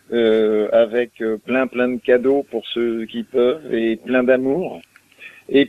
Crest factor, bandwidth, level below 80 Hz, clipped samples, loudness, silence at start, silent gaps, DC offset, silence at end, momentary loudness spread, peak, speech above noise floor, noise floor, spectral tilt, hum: 16 dB; 11 kHz; -62 dBFS; under 0.1%; -19 LUFS; 0.1 s; none; under 0.1%; 0 s; 9 LU; -2 dBFS; 25 dB; -43 dBFS; -6.5 dB/octave; none